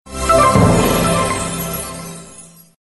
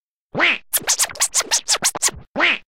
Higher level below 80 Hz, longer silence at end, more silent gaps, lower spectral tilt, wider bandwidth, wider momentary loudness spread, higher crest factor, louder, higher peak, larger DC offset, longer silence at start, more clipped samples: first, -30 dBFS vs -52 dBFS; first, 0.35 s vs 0.1 s; second, none vs 2.28-2.35 s; first, -5 dB/octave vs 0.5 dB/octave; second, 12 kHz vs 17 kHz; first, 18 LU vs 4 LU; about the same, 16 dB vs 16 dB; first, -14 LUFS vs -17 LUFS; first, 0 dBFS vs -4 dBFS; second, under 0.1% vs 0.5%; second, 0.05 s vs 0.35 s; neither